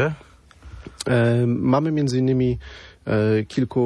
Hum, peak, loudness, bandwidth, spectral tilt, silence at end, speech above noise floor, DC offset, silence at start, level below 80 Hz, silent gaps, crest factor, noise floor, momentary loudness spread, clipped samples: none; -6 dBFS; -21 LUFS; 11 kHz; -7.5 dB/octave; 0 s; 24 dB; under 0.1%; 0 s; -46 dBFS; none; 16 dB; -44 dBFS; 18 LU; under 0.1%